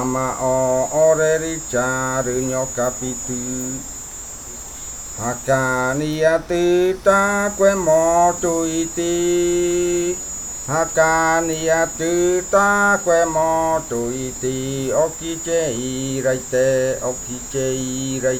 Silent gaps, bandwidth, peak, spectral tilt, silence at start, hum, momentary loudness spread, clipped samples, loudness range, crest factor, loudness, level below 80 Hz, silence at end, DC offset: none; 19 kHz; -2 dBFS; -4 dB/octave; 0 s; none; 10 LU; under 0.1%; 6 LU; 16 dB; -19 LUFS; -42 dBFS; 0 s; under 0.1%